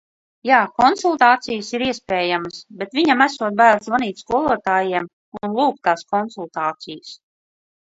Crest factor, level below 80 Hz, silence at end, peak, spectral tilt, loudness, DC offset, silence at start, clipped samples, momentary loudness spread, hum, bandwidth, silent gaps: 20 dB; -58 dBFS; 0.8 s; 0 dBFS; -4 dB/octave; -18 LUFS; under 0.1%; 0.45 s; under 0.1%; 16 LU; none; 8 kHz; 5.13-5.32 s